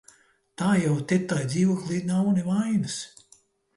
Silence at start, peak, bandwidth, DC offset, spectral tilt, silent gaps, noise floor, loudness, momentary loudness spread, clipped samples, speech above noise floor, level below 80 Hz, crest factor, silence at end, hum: 0.6 s; -12 dBFS; 11.5 kHz; under 0.1%; -6 dB/octave; none; -60 dBFS; -25 LUFS; 7 LU; under 0.1%; 36 dB; -64 dBFS; 14 dB; 0.7 s; none